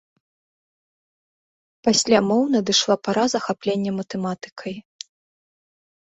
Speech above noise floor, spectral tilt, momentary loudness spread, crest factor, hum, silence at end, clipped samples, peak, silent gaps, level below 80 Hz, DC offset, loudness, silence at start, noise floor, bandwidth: over 69 dB; -3.5 dB/octave; 17 LU; 20 dB; none; 1.25 s; under 0.1%; -4 dBFS; 4.52-4.56 s; -64 dBFS; under 0.1%; -21 LUFS; 1.85 s; under -90 dBFS; 8.4 kHz